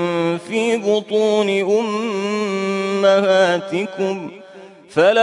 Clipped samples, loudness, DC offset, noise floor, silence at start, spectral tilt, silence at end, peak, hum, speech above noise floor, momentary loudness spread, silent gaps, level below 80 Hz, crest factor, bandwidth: under 0.1%; -18 LUFS; under 0.1%; -40 dBFS; 0 s; -5 dB/octave; 0 s; -4 dBFS; none; 24 dB; 8 LU; none; -68 dBFS; 14 dB; 11 kHz